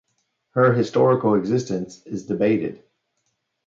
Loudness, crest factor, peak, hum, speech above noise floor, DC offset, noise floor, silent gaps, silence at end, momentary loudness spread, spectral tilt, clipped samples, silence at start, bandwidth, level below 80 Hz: -21 LUFS; 18 dB; -4 dBFS; none; 53 dB; under 0.1%; -74 dBFS; none; 0.9 s; 13 LU; -7.5 dB/octave; under 0.1%; 0.55 s; 7.8 kHz; -62 dBFS